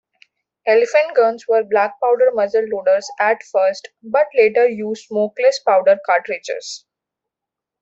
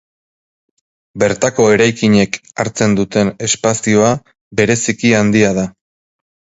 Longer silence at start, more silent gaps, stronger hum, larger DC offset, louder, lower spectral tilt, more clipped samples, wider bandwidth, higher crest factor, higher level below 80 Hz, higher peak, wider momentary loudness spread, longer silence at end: second, 0.65 s vs 1.15 s; second, none vs 4.41-4.51 s; neither; neither; second, -17 LUFS vs -14 LUFS; about the same, -3.5 dB/octave vs -4.5 dB/octave; neither; about the same, 8 kHz vs 8 kHz; about the same, 16 dB vs 14 dB; second, -70 dBFS vs -46 dBFS; about the same, -2 dBFS vs 0 dBFS; about the same, 11 LU vs 9 LU; first, 1.05 s vs 0.9 s